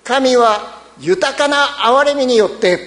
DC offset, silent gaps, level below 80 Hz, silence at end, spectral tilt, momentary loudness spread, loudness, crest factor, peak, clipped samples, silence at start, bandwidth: under 0.1%; none; -52 dBFS; 0 s; -3 dB/octave; 8 LU; -13 LUFS; 14 dB; 0 dBFS; under 0.1%; 0.05 s; 11 kHz